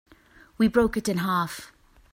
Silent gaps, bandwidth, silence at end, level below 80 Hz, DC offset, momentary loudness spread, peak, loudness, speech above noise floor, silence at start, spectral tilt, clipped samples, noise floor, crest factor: none; 16 kHz; 0.45 s; -48 dBFS; under 0.1%; 10 LU; -8 dBFS; -25 LUFS; 31 dB; 0.6 s; -5.5 dB/octave; under 0.1%; -55 dBFS; 20 dB